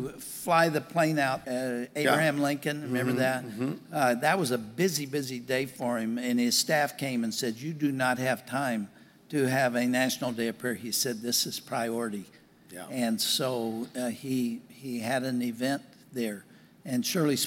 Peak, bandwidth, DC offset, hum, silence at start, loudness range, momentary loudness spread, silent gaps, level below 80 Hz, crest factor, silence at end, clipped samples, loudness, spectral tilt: -10 dBFS; 17 kHz; under 0.1%; none; 0 s; 4 LU; 10 LU; none; -72 dBFS; 20 dB; 0 s; under 0.1%; -29 LUFS; -4 dB/octave